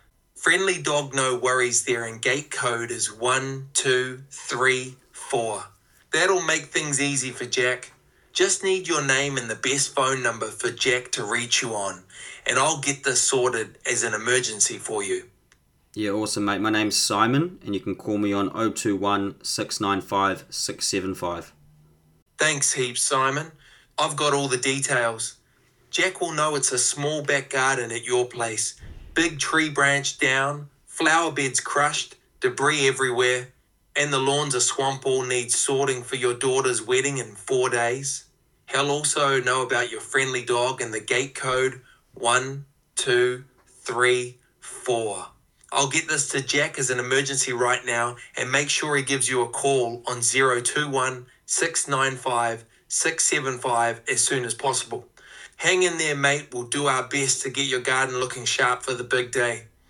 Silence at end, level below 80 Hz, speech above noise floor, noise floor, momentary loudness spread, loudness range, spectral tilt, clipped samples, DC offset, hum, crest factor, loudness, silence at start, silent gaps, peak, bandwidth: 0.25 s; -60 dBFS; 38 dB; -62 dBFS; 9 LU; 2 LU; -2.5 dB/octave; under 0.1%; under 0.1%; none; 20 dB; -23 LUFS; 0.35 s; 22.22-22.26 s; -4 dBFS; 17.5 kHz